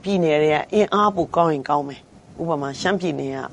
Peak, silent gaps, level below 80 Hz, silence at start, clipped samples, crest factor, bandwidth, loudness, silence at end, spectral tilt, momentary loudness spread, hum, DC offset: -4 dBFS; none; -56 dBFS; 0.05 s; under 0.1%; 18 dB; 10.5 kHz; -21 LUFS; 0 s; -6 dB/octave; 8 LU; none; under 0.1%